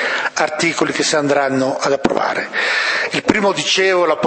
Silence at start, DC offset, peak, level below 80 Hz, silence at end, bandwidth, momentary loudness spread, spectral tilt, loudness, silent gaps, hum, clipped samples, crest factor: 0 s; under 0.1%; 0 dBFS; -52 dBFS; 0 s; 8.8 kHz; 4 LU; -3 dB/octave; -16 LUFS; none; none; under 0.1%; 16 dB